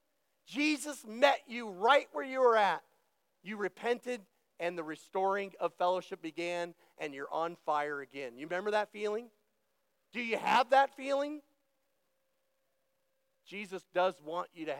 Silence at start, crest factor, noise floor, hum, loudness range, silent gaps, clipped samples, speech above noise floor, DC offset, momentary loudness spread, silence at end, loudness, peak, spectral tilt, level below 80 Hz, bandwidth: 0.5 s; 24 dB; -81 dBFS; none; 7 LU; none; under 0.1%; 47 dB; under 0.1%; 15 LU; 0 s; -33 LUFS; -12 dBFS; -3.5 dB/octave; under -90 dBFS; 16.5 kHz